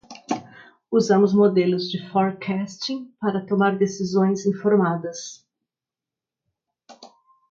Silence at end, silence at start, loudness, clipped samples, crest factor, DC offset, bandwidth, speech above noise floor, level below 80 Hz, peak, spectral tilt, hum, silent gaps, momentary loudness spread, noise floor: 0.45 s; 0.1 s; -22 LUFS; under 0.1%; 18 dB; under 0.1%; 7.6 kHz; 68 dB; -70 dBFS; -6 dBFS; -6 dB/octave; none; none; 13 LU; -89 dBFS